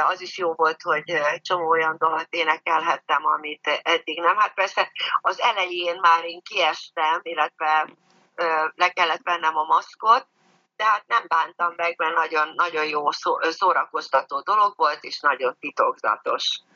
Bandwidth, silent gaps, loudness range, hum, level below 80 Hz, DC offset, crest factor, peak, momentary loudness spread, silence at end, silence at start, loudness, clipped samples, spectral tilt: 7.2 kHz; none; 1 LU; none; -88 dBFS; under 0.1%; 18 dB; -4 dBFS; 4 LU; 0.15 s; 0 s; -22 LUFS; under 0.1%; -2 dB/octave